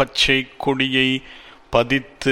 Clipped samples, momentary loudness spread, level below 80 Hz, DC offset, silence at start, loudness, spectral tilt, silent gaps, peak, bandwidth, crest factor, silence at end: under 0.1%; 6 LU; -44 dBFS; under 0.1%; 0 s; -19 LUFS; -4 dB/octave; none; -2 dBFS; 13.5 kHz; 18 dB; 0 s